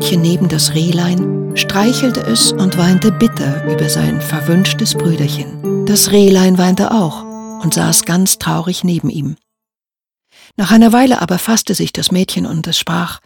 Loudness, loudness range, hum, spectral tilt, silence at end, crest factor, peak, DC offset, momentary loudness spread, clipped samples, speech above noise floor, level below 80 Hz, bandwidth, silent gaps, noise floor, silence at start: -12 LUFS; 3 LU; none; -4.5 dB/octave; 0.1 s; 12 dB; 0 dBFS; under 0.1%; 10 LU; under 0.1%; over 78 dB; -46 dBFS; 19 kHz; none; under -90 dBFS; 0 s